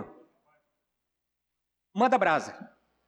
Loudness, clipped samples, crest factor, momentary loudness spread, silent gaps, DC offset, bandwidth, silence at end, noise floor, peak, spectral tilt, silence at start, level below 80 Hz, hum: -25 LUFS; under 0.1%; 20 dB; 24 LU; none; under 0.1%; 10 kHz; 0.45 s; -84 dBFS; -12 dBFS; -5 dB/octave; 0 s; -76 dBFS; 60 Hz at -65 dBFS